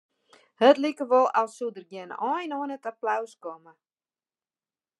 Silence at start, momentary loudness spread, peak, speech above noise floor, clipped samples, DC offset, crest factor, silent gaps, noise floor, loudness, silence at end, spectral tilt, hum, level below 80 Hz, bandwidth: 0.6 s; 19 LU; -6 dBFS; over 64 dB; under 0.1%; under 0.1%; 22 dB; none; under -90 dBFS; -25 LUFS; 1.45 s; -4 dB/octave; none; under -90 dBFS; 11.5 kHz